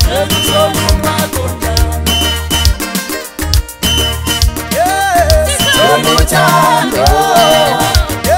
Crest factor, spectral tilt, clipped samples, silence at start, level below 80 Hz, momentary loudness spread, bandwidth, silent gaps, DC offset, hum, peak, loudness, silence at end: 10 dB; -3.5 dB/octave; under 0.1%; 0 s; -18 dBFS; 7 LU; 16.5 kHz; none; 0.2%; none; 0 dBFS; -11 LUFS; 0 s